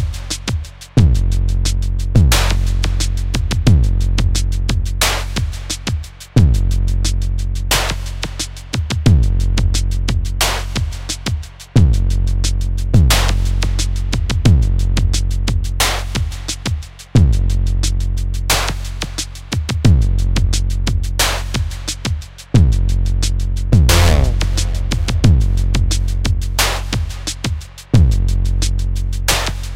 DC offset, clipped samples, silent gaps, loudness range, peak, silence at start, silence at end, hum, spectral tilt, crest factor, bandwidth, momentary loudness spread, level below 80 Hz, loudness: under 0.1%; under 0.1%; none; 3 LU; 0 dBFS; 0 s; 0 s; none; -4.5 dB/octave; 14 dB; 16.5 kHz; 9 LU; -18 dBFS; -17 LUFS